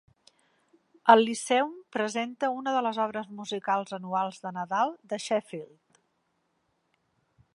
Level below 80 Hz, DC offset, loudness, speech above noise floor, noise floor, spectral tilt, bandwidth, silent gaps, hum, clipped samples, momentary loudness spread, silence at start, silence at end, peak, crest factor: -82 dBFS; under 0.1%; -28 LUFS; 47 dB; -75 dBFS; -4 dB/octave; 11.5 kHz; none; none; under 0.1%; 15 LU; 1.05 s; 1.9 s; -4 dBFS; 26 dB